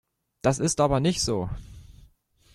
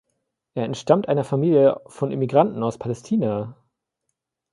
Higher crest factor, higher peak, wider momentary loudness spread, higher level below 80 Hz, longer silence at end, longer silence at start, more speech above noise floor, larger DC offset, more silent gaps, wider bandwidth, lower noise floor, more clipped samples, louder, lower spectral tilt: about the same, 20 dB vs 20 dB; second, -6 dBFS vs -2 dBFS; about the same, 11 LU vs 12 LU; first, -44 dBFS vs -62 dBFS; second, 0.65 s vs 1 s; about the same, 0.45 s vs 0.55 s; second, 36 dB vs 58 dB; neither; neither; first, 13.5 kHz vs 11.5 kHz; second, -60 dBFS vs -79 dBFS; neither; second, -25 LUFS vs -21 LUFS; second, -5 dB/octave vs -8 dB/octave